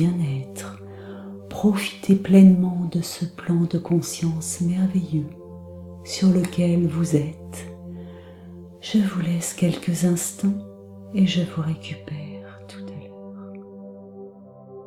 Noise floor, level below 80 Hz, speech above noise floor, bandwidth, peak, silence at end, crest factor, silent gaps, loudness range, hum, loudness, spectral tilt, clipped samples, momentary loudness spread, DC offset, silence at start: -43 dBFS; -56 dBFS; 23 dB; 14.5 kHz; -4 dBFS; 0 s; 20 dB; none; 8 LU; none; -22 LUFS; -6.5 dB/octave; under 0.1%; 21 LU; under 0.1%; 0 s